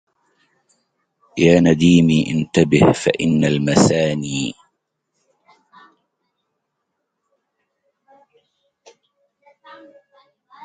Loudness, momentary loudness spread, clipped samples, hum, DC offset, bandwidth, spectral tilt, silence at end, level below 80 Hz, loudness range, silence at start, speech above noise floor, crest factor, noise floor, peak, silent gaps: -16 LUFS; 11 LU; under 0.1%; none; under 0.1%; 9.4 kHz; -6 dB/octave; 6.1 s; -48 dBFS; 13 LU; 1.35 s; 61 dB; 20 dB; -76 dBFS; 0 dBFS; none